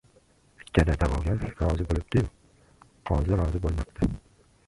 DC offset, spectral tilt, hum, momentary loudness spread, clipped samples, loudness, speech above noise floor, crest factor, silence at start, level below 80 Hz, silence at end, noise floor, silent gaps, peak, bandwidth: under 0.1%; -8 dB/octave; none; 6 LU; under 0.1%; -28 LUFS; 36 dB; 22 dB; 0.75 s; -32 dBFS; 0.5 s; -61 dBFS; none; -6 dBFS; 11.5 kHz